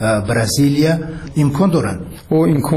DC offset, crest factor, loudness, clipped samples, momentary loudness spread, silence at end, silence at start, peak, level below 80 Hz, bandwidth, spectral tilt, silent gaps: under 0.1%; 10 dB; -16 LUFS; under 0.1%; 9 LU; 0 s; 0 s; -4 dBFS; -38 dBFS; 14 kHz; -6 dB/octave; none